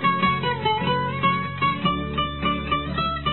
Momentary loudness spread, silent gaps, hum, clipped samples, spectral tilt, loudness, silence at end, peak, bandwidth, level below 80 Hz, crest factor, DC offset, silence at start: 3 LU; none; none; under 0.1%; -10 dB/octave; -23 LUFS; 0 s; -8 dBFS; 4.3 kHz; -40 dBFS; 14 dB; 0.4%; 0 s